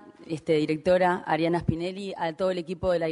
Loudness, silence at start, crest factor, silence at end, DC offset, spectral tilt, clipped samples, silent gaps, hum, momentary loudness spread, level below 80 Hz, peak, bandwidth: -26 LUFS; 0.05 s; 18 dB; 0 s; under 0.1%; -7 dB/octave; under 0.1%; none; none; 9 LU; -52 dBFS; -10 dBFS; 10.5 kHz